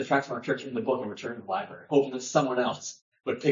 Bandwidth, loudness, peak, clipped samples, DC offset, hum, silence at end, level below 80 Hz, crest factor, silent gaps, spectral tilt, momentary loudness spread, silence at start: 7.6 kHz; -29 LUFS; -8 dBFS; under 0.1%; under 0.1%; none; 0 s; -78 dBFS; 20 dB; 3.02-3.12 s; -4.5 dB/octave; 11 LU; 0 s